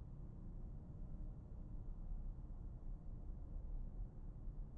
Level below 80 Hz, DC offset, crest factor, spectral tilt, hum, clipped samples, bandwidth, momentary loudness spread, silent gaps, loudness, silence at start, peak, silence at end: -50 dBFS; under 0.1%; 12 dB; -11.5 dB/octave; none; under 0.1%; 1.8 kHz; 2 LU; none; -55 LUFS; 0 s; -38 dBFS; 0 s